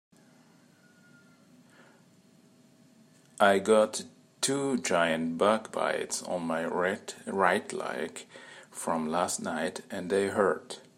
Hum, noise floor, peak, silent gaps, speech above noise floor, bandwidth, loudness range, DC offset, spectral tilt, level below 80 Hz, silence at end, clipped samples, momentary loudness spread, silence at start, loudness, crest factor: none; -60 dBFS; -8 dBFS; none; 31 dB; 16 kHz; 4 LU; under 0.1%; -3.5 dB/octave; -78 dBFS; 0.15 s; under 0.1%; 13 LU; 3.4 s; -29 LUFS; 22 dB